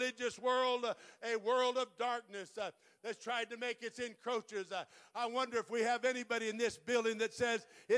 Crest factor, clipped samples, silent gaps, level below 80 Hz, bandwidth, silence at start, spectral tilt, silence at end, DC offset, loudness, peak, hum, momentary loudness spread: 16 dB; under 0.1%; none; -80 dBFS; 11 kHz; 0 s; -2.5 dB/octave; 0 s; under 0.1%; -38 LUFS; -22 dBFS; none; 11 LU